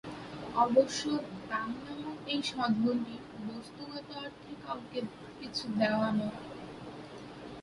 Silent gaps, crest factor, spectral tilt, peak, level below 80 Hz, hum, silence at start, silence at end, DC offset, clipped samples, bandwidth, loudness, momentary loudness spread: none; 22 dB; -5 dB/octave; -12 dBFS; -66 dBFS; none; 0.05 s; 0 s; under 0.1%; under 0.1%; 11.5 kHz; -34 LUFS; 17 LU